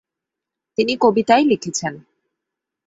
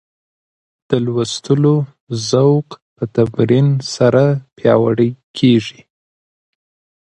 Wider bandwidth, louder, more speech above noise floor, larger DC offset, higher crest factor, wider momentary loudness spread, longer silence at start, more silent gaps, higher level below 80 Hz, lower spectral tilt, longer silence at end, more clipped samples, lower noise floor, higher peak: second, 8.2 kHz vs 9.4 kHz; second, -18 LUFS vs -15 LUFS; second, 67 dB vs over 76 dB; neither; about the same, 18 dB vs 16 dB; first, 12 LU vs 8 LU; about the same, 0.8 s vs 0.9 s; second, none vs 2.00-2.07 s, 2.82-2.96 s, 5.23-5.34 s; second, -62 dBFS vs -54 dBFS; second, -4 dB/octave vs -7 dB/octave; second, 0.9 s vs 1.35 s; neither; second, -84 dBFS vs under -90 dBFS; about the same, -2 dBFS vs 0 dBFS